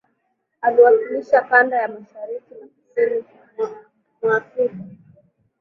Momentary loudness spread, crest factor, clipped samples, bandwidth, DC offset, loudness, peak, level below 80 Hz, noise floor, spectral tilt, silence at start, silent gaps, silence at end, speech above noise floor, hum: 18 LU; 18 dB; under 0.1%; 6 kHz; under 0.1%; -19 LUFS; -2 dBFS; -70 dBFS; -71 dBFS; -7 dB/octave; 0.65 s; none; 0.65 s; 53 dB; none